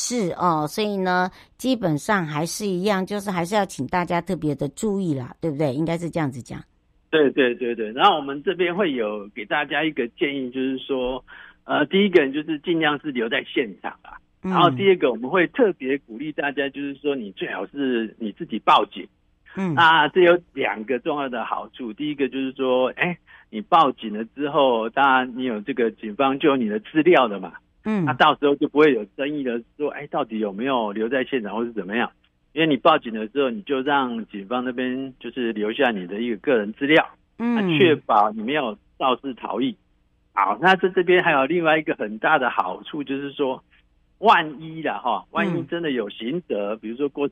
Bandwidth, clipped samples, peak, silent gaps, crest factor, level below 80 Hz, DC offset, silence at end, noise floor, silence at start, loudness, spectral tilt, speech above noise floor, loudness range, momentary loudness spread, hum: 15 kHz; under 0.1%; -4 dBFS; none; 18 dB; -60 dBFS; under 0.1%; 0 s; -63 dBFS; 0 s; -22 LUFS; -5 dB/octave; 41 dB; 4 LU; 12 LU; none